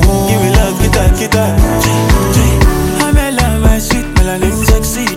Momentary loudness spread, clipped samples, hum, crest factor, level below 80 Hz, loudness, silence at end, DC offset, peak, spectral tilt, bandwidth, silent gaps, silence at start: 2 LU; under 0.1%; none; 10 dB; -14 dBFS; -11 LUFS; 0 s; under 0.1%; 0 dBFS; -5 dB/octave; 17 kHz; none; 0 s